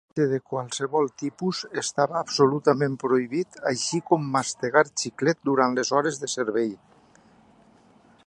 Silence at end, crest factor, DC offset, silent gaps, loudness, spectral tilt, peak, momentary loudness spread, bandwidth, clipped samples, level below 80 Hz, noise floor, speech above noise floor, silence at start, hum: 1.5 s; 22 dB; under 0.1%; none; -25 LUFS; -4.5 dB/octave; -4 dBFS; 7 LU; 11.5 kHz; under 0.1%; -72 dBFS; -56 dBFS; 32 dB; 0.15 s; none